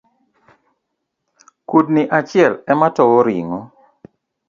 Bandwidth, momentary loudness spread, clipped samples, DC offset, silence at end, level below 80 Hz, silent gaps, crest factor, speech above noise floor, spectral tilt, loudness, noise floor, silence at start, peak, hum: 7.4 kHz; 10 LU; under 0.1%; under 0.1%; 0.85 s; -62 dBFS; none; 18 dB; 61 dB; -7.5 dB/octave; -15 LUFS; -75 dBFS; 1.7 s; 0 dBFS; none